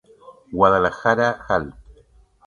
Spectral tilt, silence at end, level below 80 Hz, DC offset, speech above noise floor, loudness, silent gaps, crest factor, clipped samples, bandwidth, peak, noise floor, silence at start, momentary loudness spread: -6 dB/octave; 0.75 s; -46 dBFS; under 0.1%; 35 dB; -19 LUFS; none; 22 dB; under 0.1%; 10 kHz; 0 dBFS; -54 dBFS; 0.5 s; 12 LU